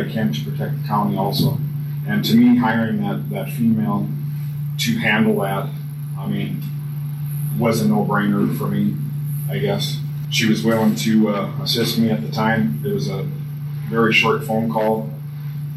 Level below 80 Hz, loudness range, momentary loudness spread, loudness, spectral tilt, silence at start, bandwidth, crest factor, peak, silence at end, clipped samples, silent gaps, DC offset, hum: -56 dBFS; 3 LU; 10 LU; -20 LUFS; -6 dB/octave; 0 s; 14 kHz; 16 dB; -4 dBFS; 0 s; under 0.1%; none; under 0.1%; none